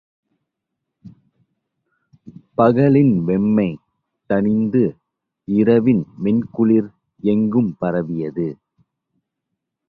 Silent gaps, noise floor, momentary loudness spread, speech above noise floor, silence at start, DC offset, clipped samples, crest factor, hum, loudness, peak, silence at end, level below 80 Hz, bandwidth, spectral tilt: none; -79 dBFS; 11 LU; 63 dB; 1.05 s; under 0.1%; under 0.1%; 18 dB; none; -18 LUFS; -2 dBFS; 1.35 s; -54 dBFS; 4.6 kHz; -11.5 dB/octave